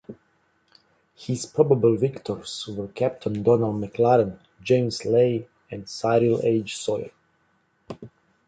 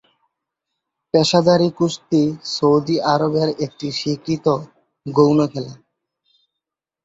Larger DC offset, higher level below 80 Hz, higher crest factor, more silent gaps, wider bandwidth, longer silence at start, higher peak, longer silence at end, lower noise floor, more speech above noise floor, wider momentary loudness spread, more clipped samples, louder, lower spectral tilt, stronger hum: neither; about the same, -60 dBFS vs -58 dBFS; about the same, 20 dB vs 18 dB; neither; first, 9.4 kHz vs 8 kHz; second, 0.1 s vs 1.15 s; about the same, -4 dBFS vs -2 dBFS; second, 0.4 s vs 1.3 s; second, -67 dBFS vs -84 dBFS; second, 44 dB vs 67 dB; first, 19 LU vs 10 LU; neither; second, -23 LUFS vs -18 LUFS; about the same, -6.5 dB/octave vs -6 dB/octave; neither